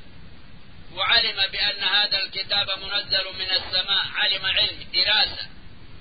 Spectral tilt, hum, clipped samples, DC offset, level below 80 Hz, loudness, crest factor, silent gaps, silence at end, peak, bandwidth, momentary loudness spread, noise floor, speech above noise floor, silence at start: -6 dB/octave; none; under 0.1%; 1%; -50 dBFS; -21 LUFS; 18 dB; none; 0 s; -6 dBFS; 5 kHz; 6 LU; -46 dBFS; 22 dB; 0 s